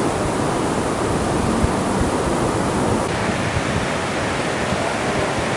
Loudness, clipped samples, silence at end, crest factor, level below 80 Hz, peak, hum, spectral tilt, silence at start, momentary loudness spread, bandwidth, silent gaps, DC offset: -20 LUFS; under 0.1%; 0 s; 16 dB; -34 dBFS; -4 dBFS; none; -5 dB/octave; 0 s; 2 LU; 11.5 kHz; none; under 0.1%